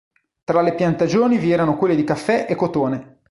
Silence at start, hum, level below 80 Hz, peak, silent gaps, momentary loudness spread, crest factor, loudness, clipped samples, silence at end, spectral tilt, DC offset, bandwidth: 0.5 s; none; -52 dBFS; -4 dBFS; none; 6 LU; 16 dB; -19 LUFS; under 0.1%; 0.25 s; -7 dB/octave; under 0.1%; 11.5 kHz